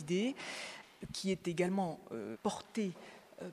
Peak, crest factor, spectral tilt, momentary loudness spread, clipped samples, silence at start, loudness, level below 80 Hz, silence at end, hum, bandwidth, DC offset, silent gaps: -20 dBFS; 20 dB; -5 dB/octave; 15 LU; under 0.1%; 0 s; -39 LUFS; -70 dBFS; 0 s; none; 14 kHz; under 0.1%; none